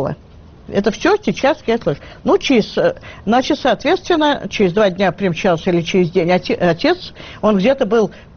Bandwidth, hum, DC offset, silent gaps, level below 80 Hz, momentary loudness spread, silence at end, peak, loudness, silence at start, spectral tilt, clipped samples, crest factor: 6.8 kHz; none; under 0.1%; none; -42 dBFS; 6 LU; 0.15 s; -2 dBFS; -16 LUFS; 0 s; -4.5 dB/octave; under 0.1%; 14 dB